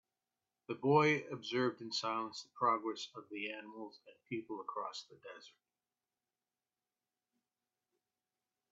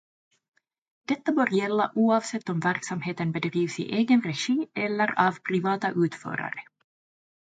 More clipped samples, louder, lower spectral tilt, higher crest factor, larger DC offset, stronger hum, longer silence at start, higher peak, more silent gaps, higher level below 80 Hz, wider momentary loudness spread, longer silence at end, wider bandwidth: neither; second, -37 LUFS vs -26 LUFS; second, -3.5 dB/octave vs -5.5 dB/octave; about the same, 24 dB vs 20 dB; neither; neither; second, 0.7 s vs 1.1 s; second, -16 dBFS vs -8 dBFS; neither; second, -86 dBFS vs -74 dBFS; first, 20 LU vs 9 LU; first, 3.2 s vs 0.95 s; second, 7.8 kHz vs 9.4 kHz